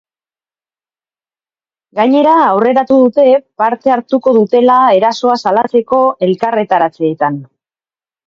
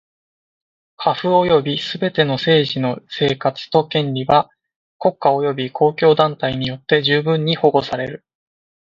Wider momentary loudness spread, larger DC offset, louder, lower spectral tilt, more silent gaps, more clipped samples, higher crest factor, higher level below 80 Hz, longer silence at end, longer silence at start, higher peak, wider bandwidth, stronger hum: about the same, 6 LU vs 8 LU; neither; first, -11 LUFS vs -17 LUFS; about the same, -6.5 dB/octave vs -7 dB/octave; second, none vs 4.76-5.00 s; neither; second, 12 dB vs 18 dB; second, -60 dBFS vs -54 dBFS; about the same, 0.85 s vs 0.8 s; first, 1.95 s vs 1 s; about the same, 0 dBFS vs 0 dBFS; about the same, 7.2 kHz vs 7.4 kHz; neither